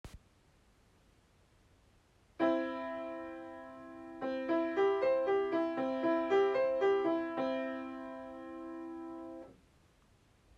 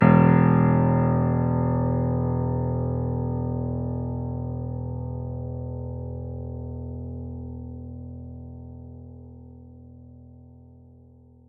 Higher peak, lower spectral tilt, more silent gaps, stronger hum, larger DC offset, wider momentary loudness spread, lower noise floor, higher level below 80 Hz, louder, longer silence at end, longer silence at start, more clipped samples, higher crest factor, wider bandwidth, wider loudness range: second, -20 dBFS vs -4 dBFS; second, -6 dB/octave vs -13 dB/octave; neither; neither; neither; second, 18 LU vs 22 LU; first, -67 dBFS vs -52 dBFS; second, -70 dBFS vs -44 dBFS; second, -34 LUFS vs -25 LUFS; second, 1.05 s vs 1.25 s; about the same, 0.05 s vs 0 s; neither; about the same, 16 dB vs 20 dB; first, 7.2 kHz vs 3.3 kHz; second, 9 LU vs 19 LU